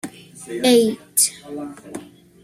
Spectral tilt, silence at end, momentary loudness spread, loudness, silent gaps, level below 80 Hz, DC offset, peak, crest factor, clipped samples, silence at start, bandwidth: -2.5 dB/octave; 0.4 s; 21 LU; -17 LUFS; none; -64 dBFS; under 0.1%; -4 dBFS; 18 dB; under 0.1%; 0.05 s; 15.5 kHz